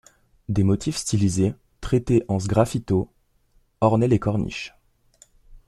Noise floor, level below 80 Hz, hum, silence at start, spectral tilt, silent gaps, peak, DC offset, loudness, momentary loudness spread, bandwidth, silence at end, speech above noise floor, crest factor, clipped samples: -62 dBFS; -44 dBFS; none; 0.5 s; -6.5 dB/octave; none; -4 dBFS; under 0.1%; -23 LUFS; 13 LU; 13 kHz; 0.1 s; 41 dB; 20 dB; under 0.1%